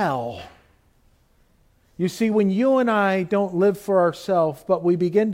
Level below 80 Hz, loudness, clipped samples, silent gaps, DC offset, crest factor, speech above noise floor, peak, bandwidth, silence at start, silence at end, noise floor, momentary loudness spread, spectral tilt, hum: -60 dBFS; -21 LUFS; under 0.1%; none; under 0.1%; 14 dB; 39 dB; -6 dBFS; 16.5 kHz; 0 s; 0 s; -60 dBFS; 9 LU; -7 dB/octave; none